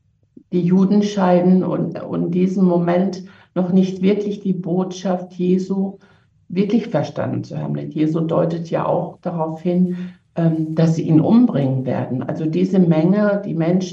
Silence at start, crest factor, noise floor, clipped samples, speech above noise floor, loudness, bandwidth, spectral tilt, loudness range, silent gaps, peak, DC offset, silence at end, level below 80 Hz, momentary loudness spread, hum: 0.5 s; 16 dB; -50 dBFS; under 0.1%; 32 dB; -18 LUFS; 7.4 kHz; -8.5 dB/octave; 5 LU; none; -2 dBFS; under 0.1%; 0 s; -62 dBFS; 9 LU; none